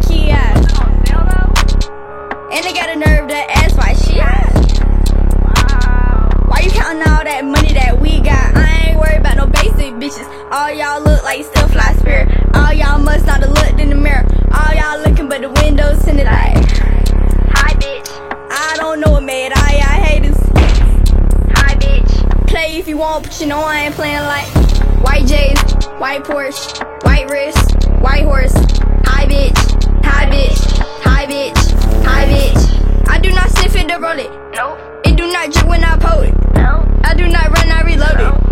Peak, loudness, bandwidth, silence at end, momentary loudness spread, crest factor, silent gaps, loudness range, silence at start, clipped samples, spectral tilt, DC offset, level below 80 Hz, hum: 0 dBFS; -13 LUFS; 14 kHz; 0 s; 6 LU; 10 dB; none; 2 LU; 0 s; under 0.1%; -5.5 dB/octave; 0.6%; -10 dBFS; none